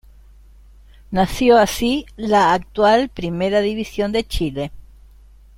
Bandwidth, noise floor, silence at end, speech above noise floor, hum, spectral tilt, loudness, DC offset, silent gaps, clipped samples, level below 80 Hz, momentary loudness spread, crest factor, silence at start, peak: 16.5 kHz; -45 dBFS; 0.8 s; 28 dB; none; -5 dB/octave; -18 LUFS; under 0.1%; none; under 0.1%; -38 dBFS; 10 LU; 18 dB; 1.1 s; -2 dBFS